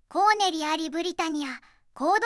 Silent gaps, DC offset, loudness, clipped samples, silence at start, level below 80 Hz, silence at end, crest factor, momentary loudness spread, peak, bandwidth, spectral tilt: none; under 0.1%; -26 LUFS; under 0.1%; 0.1 s; -66 dBFS; 0 s; 18 dB; 12 LU; -8 dBFS; 12 kHz; -1 dB/octave